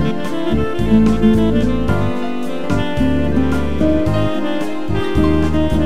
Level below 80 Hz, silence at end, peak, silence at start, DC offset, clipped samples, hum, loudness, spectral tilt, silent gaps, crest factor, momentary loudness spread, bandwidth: -26 dBFS; 0 s; -2 dBFS; 0 s; 9%; under 0.1%; none; -17 LUFS; -7.5 dB/octave; none; 14 dB; 8 LU; 13.5 kHz